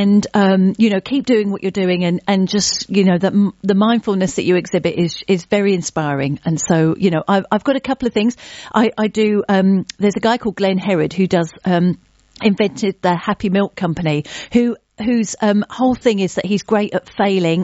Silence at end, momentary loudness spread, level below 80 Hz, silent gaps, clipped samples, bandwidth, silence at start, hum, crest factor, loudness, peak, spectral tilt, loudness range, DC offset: 0 s; 5 LU; -50 dBFS; none; under 0.1%; 8 kHz; 0 s; none; 16 dB; -17 LUFS; 0 dBFS; -5.5 dB/octave; 2 LU; under 0.1%